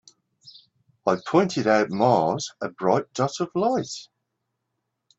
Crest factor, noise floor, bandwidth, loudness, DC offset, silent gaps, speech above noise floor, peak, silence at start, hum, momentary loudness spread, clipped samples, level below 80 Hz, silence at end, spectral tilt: 20 dB; -79 dBFS; 8.2 kHz; -23 LUFS; under 0.1%; none; 56 dB; -4 dBFS; 0.45 s; none; 9 LU; under 0.1%; -66 dBFS; 1.15 s; -5.5 dB/octave